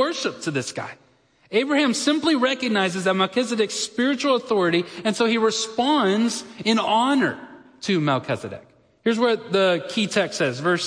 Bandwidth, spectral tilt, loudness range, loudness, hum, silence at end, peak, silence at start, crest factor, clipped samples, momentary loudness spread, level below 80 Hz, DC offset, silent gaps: 10.5 kHz; -4 dB/octave; 2 LU; -22 LUFS; none; 0 s; -6 dBFS; 0 s; 16 dB; under 0.1%; 8 LU; -70 dBFS; under 0.1%; none